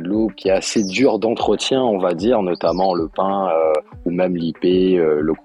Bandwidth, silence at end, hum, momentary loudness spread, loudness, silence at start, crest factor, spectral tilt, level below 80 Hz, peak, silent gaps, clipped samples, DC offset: 11.5 kHz; 0.1 s; none; 4 LU; -18 LUFS; 0 s; 14 dB; -5.5 dB/octave; -46 dBFS; -4 dBFS; none; under 0.1%; under 0.1%